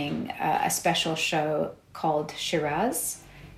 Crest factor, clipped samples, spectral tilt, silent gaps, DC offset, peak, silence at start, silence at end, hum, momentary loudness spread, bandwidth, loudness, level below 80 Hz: 16 dB; under 0.1%; -3 dB/octave; none; under 0.1%; -12 dBFS; 0 s; 0 s; none; 7 LU; 16 kHz; -27 LUFS; -58 dBFS